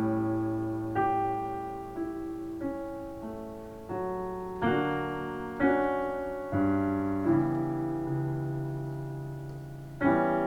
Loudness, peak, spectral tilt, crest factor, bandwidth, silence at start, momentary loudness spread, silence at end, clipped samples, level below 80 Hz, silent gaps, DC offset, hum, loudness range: -31 LUFS; -14 dBFS; -8.5 dB/octave; 18 dB; 16.5 kHz; 0 s; 12 LU; 0 s; under 0.1%; -54 dBFS; none; under 0.1%; none; 5 LU